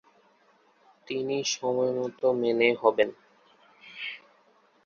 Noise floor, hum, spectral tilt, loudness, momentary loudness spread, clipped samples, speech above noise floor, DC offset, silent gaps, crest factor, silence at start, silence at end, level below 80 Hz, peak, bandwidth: -63 dBFS; none; -3.5 dB/octave; -27 LUFS; 14 LU; under 0.1%; 38 dB; under 0.1%; none; 22 dB; 1.1 s; 0.7 s; -76 dBFS; -6 dBFS; 7.4 kHz